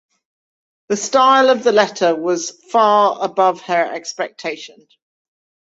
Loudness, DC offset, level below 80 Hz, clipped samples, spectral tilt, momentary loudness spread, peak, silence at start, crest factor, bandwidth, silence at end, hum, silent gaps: -16 LUFS; under 0.1%; -68 dBFS; under 0.1%; -3 dB/octave; 12 LU; 0 dBFS; 0.9 s; 16 dB; 8 kHz; 1.1 s; none; none